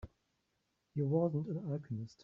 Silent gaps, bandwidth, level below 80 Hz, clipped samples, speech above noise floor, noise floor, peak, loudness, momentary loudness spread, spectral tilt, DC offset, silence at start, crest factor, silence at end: none; 7.2 kHz; -66 dBFS; under 0.1%; 46 dB; -82 dBFS; -20 dBFS; -37 LUFS; 12 LU; -11 dB/octave; under 0.1%; 0.05 s; 18 dB; 0.1 s